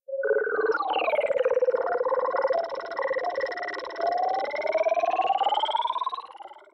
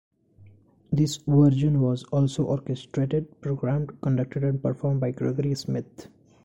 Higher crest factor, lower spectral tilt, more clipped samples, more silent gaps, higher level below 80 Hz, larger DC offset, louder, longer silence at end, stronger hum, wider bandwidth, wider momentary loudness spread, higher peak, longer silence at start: about the same, 14 dB vs 16 dB; second, -3 dB/octave vs -8 dB/octave; neither; neither; second, -74 dBFS vs -52 dBFS; neither; about the same, -26 LUFS vs -25 LUFS; second, 0.15 s vs 0.4 s; neither; about the same, 8.2 kHz vs 9 kHz; second, 7 LU vs 10 LU; second, -14 dBFS vs -8 dBFS; second, 0.1 s vs 0.9 s